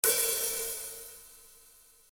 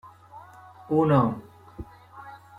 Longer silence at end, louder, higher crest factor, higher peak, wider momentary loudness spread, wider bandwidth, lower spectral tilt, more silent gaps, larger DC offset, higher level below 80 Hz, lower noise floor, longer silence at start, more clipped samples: first, 0.65 s vs 0.25 s; second, -30 LUFS vs -23 LUFS; first, 28 dB vs 20 dB; about the same, -6 dBFS vs -8 dBFS; second, 23 LU vs 26 LU; first, over 20 kHz vs 10 kHz; second, 1.5 dB/octave vs -9.5 dB/octave; neither; neither; second, -64 dBFS vs -56 dBFS; first, -59 dBFS vs -48 dBFS; about the same, 0.05 s vs 0.05 s; neither